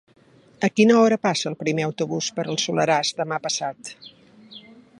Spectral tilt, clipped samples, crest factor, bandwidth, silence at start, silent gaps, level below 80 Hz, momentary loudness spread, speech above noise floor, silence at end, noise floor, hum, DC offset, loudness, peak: -4 dB/octave; under 0.1%; 20 dB; 11.5 kHz; 0.6 s; none; -70 dBFS; 10 LU; 25 dB; 0.4 s; -46 dBFS; none; under 0.1%; -22 LUFS; -4 dBFS